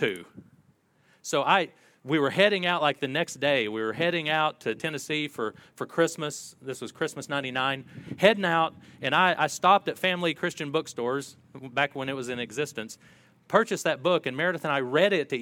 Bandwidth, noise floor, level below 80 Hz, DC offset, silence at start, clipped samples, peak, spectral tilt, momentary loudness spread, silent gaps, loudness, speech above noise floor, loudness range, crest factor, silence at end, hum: 17.5 kHz; -64 dBFS; -74 dBFS; under 0.1%; 0 s; under 0.1%; -4 dBFS; -4 dB/octave; 14 LU; none; -26 LUFS; 38 dB; 6 LU; 24 dB; 0 s; none